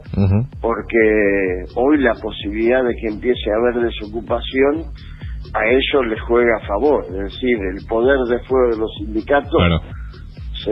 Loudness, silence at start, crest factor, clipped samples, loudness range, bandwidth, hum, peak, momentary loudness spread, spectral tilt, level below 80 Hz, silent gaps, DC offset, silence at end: -18 LUFS; 0 s; 16 dB; under 0.1%; 2 LU; 5.8 kHz; none; -2 dBFS; 12 LU; -9 dB/octave; -32 dBFS; none; under 0.1%; 0 s